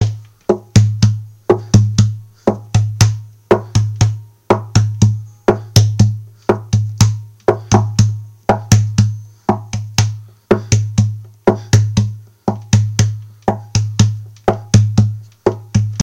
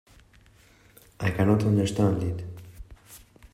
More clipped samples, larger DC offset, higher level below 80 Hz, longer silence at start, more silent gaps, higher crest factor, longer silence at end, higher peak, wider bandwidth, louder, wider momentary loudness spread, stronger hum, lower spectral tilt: first, 0.2% vs under 0.1%; neither; first, -36 dBFS vs -50 dBFS; second, 0 s vs 1.2 s; neither; about the same, 14 dB vs 18 dB; second, 0 s vs 0.35 s; first, 0 dBFS vs -10 dBFS; second, 12.5 kHz vs 15.5 kHz; first, -16 LUFS vs -25 LUFS; second, 8 LU vs 24 LU; neither; second, -6 dB/octave vs -7.5 dB/octave